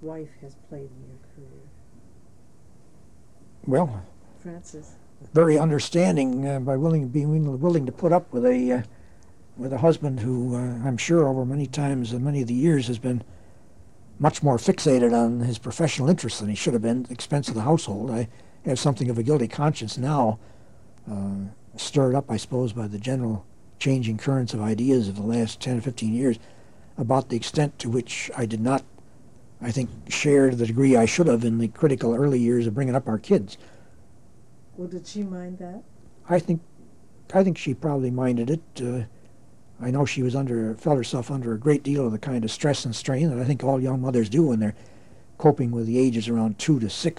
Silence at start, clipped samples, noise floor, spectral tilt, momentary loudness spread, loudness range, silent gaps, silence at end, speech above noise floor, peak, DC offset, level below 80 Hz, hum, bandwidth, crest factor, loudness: 0 s; under 0.1%; -54 dBFS; -6.5 dB/octave; 13 LU; 6 LU; none; 0.05 s; 31 dB; -6 dBFS; 0.5%; -58 dBFS; none; 11.5 kHz; 18 dB; -24 LUFS